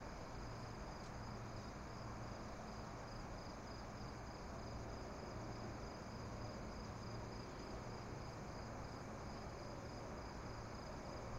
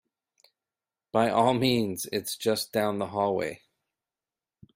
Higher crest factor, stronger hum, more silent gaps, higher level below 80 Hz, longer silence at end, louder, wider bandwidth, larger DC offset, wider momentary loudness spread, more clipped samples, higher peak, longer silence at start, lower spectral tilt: second, 12 dB vs 20 dB; neither; neither; first, -58 dBFS vs -66 dBFS; second, 0 s vs 1.2 s; second, -51 LUFS vs -27 LUFS; about the same, 16 kHz vs 16 kHz; neither; second, 1 LU vs 8 LU; neither; second, -38 dBFS vs -8 dBFS; second, 0 s vs 1.15 s; about the same, -5.5 dB/octave vs -4.5 dB/octave